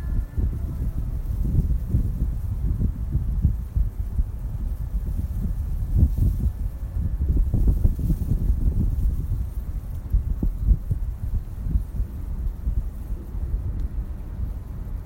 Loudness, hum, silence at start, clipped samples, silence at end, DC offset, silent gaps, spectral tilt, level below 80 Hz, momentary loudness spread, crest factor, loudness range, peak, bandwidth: -27 LUFS; none; 0 s; under 0.1%; 0 s; under 0.1%; none; -9.5 dB/octave; -24 dBFS; 9 LU; 18 dB; 5 LU; -6 dBFS; 16 kHz